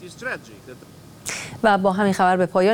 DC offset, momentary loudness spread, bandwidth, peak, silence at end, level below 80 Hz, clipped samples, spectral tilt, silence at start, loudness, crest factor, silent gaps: under 0.1%; 16 LU; 17.5 kHz; -4 dBFS; 0 s; -56 dBFS; under 0.1%; -5 dB/octave; 0 s; -21 LUFS; 18 dB; none